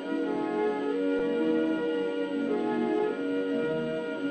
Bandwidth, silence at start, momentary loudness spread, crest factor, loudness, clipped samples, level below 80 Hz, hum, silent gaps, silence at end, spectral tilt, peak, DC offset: 8.6 kHz; 0 s; 4 LU; 12 dB; -29 LUFS; under 0.1%; -68 dBFS; none; none; 0 s; -7 dB/octave; -16 dBFS; under 0.1%